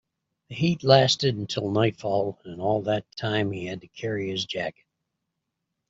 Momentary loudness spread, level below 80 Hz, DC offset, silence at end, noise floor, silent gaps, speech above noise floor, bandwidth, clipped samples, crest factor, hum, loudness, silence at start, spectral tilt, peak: 14 LU; -62 dBFS; under 0.1%; 1.2 s; -82 dBFS; none; 57 dB; 8 kHz; under 0.1%; 22 dB; none; -25 LUFS; 0.5 s; -5.5 dB/octave; -4 dBFS